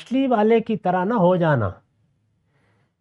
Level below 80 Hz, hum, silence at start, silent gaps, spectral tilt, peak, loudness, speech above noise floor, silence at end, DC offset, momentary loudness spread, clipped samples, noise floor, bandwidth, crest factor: -62 dBFS; none; 0 s; none; -9 dB/octave; -6 dBFS; -20 LUFS; 47 dB; 1.3 s; under 0.1%; 5 LU; under 0.1%; -66 dBFS; 7.4 kHz; 16 dB